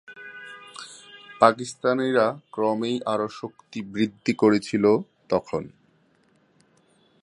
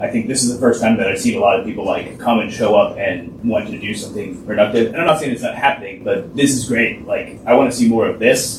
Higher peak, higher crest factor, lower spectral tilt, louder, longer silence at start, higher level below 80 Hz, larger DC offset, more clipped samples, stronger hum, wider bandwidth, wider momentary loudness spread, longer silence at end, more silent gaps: about the same, -2 dBFS vs 0 dBFS; first, 24 dB vs 16 dB; first, -5.5 dB/octave vs -4 dB/octave; second, -24 LUFS vs -17 LUFS; about the same, 0.1 s vs 0 s; second, -66 dBFS vs -48 dBFS; neither; neither; neither; second, 11 kHz vs 14.5 kHz; first, 20 LU vs 9 LU; first, 1.55 s vs 0 s; neither